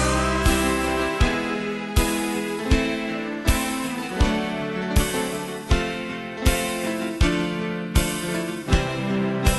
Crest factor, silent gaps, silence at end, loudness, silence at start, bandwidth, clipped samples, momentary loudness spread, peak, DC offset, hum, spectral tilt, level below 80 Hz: 18 dB; none; 0 s; -24 LUFS; 0 s; 12.5 kHz; under 0.1%; 6 LU; -6 dBFS; under 0.1%; none; -4.5 dB/octave; -28 dBFS